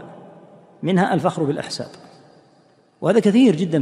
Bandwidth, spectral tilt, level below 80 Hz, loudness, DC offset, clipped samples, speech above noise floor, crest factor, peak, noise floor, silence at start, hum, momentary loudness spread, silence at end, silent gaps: 11.5 kHz; -6.5 dB/octave; -66 dBFS; -19 LUFS; under 0.1%; under 0.1%; 38 dB; 18 dB; -4 dBFS; -56 dBFS; 0 s; none; 15 LU; 0 s; none